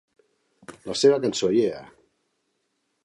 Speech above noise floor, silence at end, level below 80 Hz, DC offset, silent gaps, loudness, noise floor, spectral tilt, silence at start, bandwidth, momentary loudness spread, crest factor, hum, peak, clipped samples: 53 dB; 1.2 s; -66 dBFS; under 0.1%; none; -22 LUFS; -74 dBFS; -4.5 dB/octave; 0.7 s; 11.5 kHz; 19 LU; 20 dB; none; -6 dBFS; under 0.1%